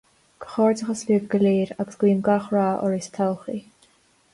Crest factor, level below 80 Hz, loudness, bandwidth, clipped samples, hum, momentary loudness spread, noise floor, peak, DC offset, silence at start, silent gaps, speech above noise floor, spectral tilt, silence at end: 14 dB; -64 dBFS; -23 LUFS; 11.5 kHz; under 0.1%; none; 12 LU; -60 dBFS; -8 dBFS; under 0.1%; 0.4 s; none; 38 dB; -7 dB/octave; 0.75 s